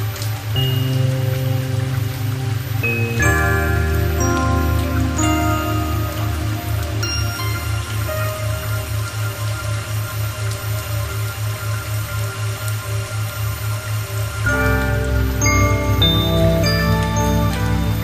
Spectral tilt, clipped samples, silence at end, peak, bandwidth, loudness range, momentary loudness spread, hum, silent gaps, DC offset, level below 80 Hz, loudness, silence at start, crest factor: -5 dB/octave; under 0.1%; 0 s; -4 dBFS; 15 kHz; 6 LU; 8 LU; none; none; under 0.1%; -26 dBFS; -20 LUFS; 0 s; 16 dB